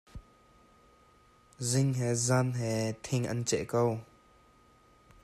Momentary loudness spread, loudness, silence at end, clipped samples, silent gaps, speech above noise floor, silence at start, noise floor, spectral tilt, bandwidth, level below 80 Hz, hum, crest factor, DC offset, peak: 10 LU; -31 LUFS; 1.2 s; under 0.1%; none; 32 dB; 0.15 s; -62 dBFS; -5 dB/octave; 14 kHz; -60 dBFS; none; 18 dB; under 0.1%; -16 dBFS